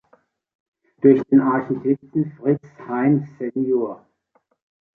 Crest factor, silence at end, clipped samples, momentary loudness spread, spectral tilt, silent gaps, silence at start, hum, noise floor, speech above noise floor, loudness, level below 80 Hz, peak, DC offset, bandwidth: 20 dB; 1 s; under 0.1%; 12 LU; -11.5 dB/octave; none; 1.05 s; none; -66 dBFS; 47 dB; -20 LUFS; -64 dBFS; -2 dBFS; under 0.1%; 3.2 kHz